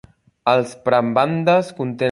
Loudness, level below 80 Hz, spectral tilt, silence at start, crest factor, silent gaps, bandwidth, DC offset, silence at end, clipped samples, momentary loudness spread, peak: -18 LUFS; -60 dBFS; -6.5 dB/octave; 0.45 s; 18 dB; none; 11.5 kHz; under 0.1%; 0 s; under 0.1%; 6 LU; -2 dBFS